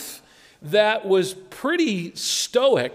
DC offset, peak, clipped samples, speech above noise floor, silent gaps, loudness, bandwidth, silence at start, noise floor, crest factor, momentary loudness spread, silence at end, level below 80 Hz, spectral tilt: under 0.1%; -6 dBFS; under 0.1%; 27 dB; none; -21 LUFS; 16 kHz; 0 s; -48 dBFS; 16 dB; 15 LU; 0 s; -68 dBFS; -3.5 dB/octave